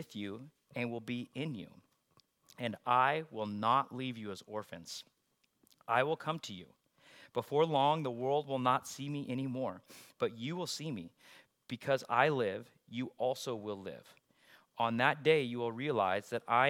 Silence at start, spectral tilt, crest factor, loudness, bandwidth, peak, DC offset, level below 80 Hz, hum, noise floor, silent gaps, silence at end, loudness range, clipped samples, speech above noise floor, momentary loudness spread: 0 s; -5 dB/octave; 24 dB; -35 LUFS; 16.5 kHz; -12 dBFS; under 0.1%; -84 dBFS; none; -78 dBFS; none; 0 s; 4 LU; under 0.1%; 43 dB; 16 LU